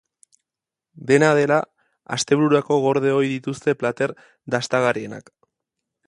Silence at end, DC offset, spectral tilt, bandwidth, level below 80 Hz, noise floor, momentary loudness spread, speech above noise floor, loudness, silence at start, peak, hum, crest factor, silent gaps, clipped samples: 0.9 s; under 0.1%; -5 dB/octave; 11.5 kHz; -66 dBFS; -88 dBFS; 17 LU; 68 dB; -20 LUFS; 1 s; -2 dBFS; none; 20 dB; none; under 0.1%